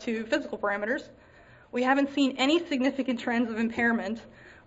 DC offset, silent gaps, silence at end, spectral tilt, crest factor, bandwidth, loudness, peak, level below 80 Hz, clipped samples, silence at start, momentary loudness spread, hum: under 0.1%; none; 0.15 s; -4.5 dB/octave; 18 dB; 8 kHz; -28 LUFS; -10 dBFS; -62 dBFS; under 0.1%; 0 s; 8 LU; none